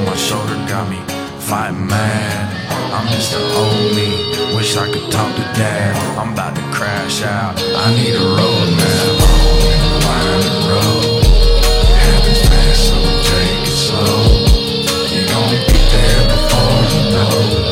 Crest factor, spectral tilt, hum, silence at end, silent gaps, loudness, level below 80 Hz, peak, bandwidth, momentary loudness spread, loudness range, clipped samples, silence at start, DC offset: 10 dB; -4.5 dB/octave; none; 0 s; none; -14 LUFS; -16 dBFS; -2 dBFS; 16.5 kHz; 7 LU; 5 LU; under 0.1%; 0 s; under 0.1%